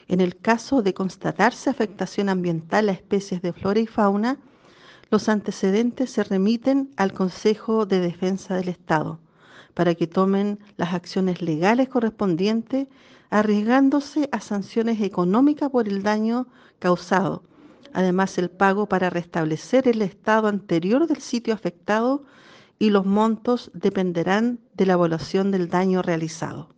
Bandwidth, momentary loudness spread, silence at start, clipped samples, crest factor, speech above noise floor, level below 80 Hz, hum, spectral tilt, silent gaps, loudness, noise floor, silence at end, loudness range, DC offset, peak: 9 kHz; 7 LU; 0.1 s; under 0.1%; 18 dB; 29 dB; -62 dBFS; none; -6.5 dB/octave; none; -22 LUFS; -50 dBFS; 0.15 s; 2 LU; under 0.1%; -4 dBFS